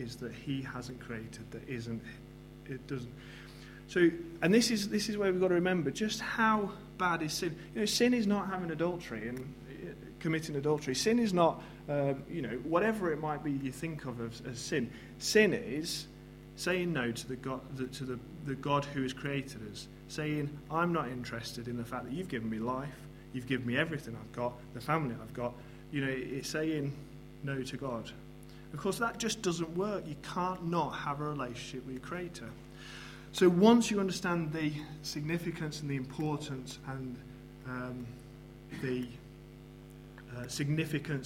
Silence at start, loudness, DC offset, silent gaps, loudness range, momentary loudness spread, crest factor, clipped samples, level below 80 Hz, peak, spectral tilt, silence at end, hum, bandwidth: 0 s; -34 LUFS; under 0.1%; none; 9 LU; 18 LU; 24 dB; under 0.1%; -58 dBFS; -10 dBFS; -5 dB/octave; 0 s; none; 16 kHz